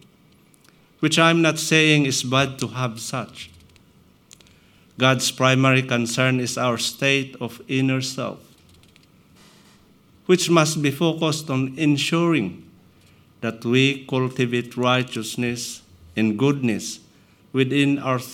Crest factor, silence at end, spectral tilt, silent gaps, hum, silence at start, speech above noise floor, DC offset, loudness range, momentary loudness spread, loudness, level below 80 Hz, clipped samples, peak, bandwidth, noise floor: 22 dB; 0 s; -4.5 dB/octave; none; none; 1 s; 34 dB; under 0.1%; 5 LU; 14 LU; -21 LUFS; -64 dBFS; under 0.1%; 0 dBFS; 16.5 kHz; -55 dBFS